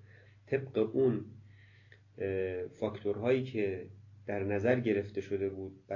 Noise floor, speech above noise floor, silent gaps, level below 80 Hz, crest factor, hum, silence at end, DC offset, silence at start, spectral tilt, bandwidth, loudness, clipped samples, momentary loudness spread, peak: -60 dBFS; 27 dB; none; -62 dBFS; 20 dB; none; 0 s; under 0.1%; 0.05 s; -8.5 dB/octave; 7.2 kHz; -34 LUFS; under 0.1%; 11 LU; -16 dBFS